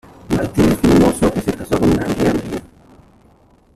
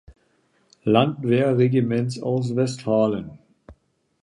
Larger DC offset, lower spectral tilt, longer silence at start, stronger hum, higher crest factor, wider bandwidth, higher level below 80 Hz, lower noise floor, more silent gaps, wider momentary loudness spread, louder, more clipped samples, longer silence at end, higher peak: neither; about the same, -6.5 dB/octave vs -7.5 dB/octave; first, 0.3 s vs 0.1 s; neither; about the same, 14 dB vs 18 dB; first, 14.5 kHz vs 11 kHz; first, -34 dBFS vs -58 dBFS; second, -51 dBFS vs -64 dBFS; neither; first, 10 LU vs 7 LU; first, -16 LUFS vs -22 LUFS; neither; first, 1.1 s vs 0.5 s; about the same, -2 dBFS vs -4 dBFS